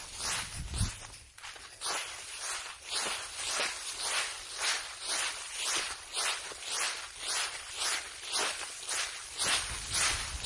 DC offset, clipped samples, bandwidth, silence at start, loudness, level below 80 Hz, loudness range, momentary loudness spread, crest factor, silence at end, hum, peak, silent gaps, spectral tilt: under 0.1%; under 0.1%; 11.5 kHz; 0 s; -33 LUFS; -52 dBFS; 3 LU; 9 LU; 20 dB; 0 s; none; -16 dBFS; none; 0 dB/octave